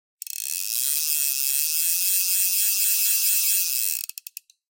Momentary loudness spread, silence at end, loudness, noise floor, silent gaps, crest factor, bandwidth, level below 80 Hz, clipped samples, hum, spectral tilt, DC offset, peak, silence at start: 12 LU; 0.7 s; -20 LUFS; -44 dBFS; none; 18 dB; 18 kHz; under -90 dBFS; under 0.1%; none; 8.5 dB/octave; under 0.1%; -6 dBFS; 0.35 s